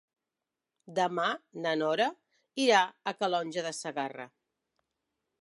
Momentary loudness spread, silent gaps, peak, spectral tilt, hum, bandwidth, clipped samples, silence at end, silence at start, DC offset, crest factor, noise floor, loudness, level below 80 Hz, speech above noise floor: 13 LU; none; -10 dBFS; -3.5 dB/octave; none; 11.5 kHz; under 0.1%; 1.15 s; 0.9 s; under 0.1%; 22 dB; -89 dBFS; -30 LUFS; -88 dBFS; 59 dB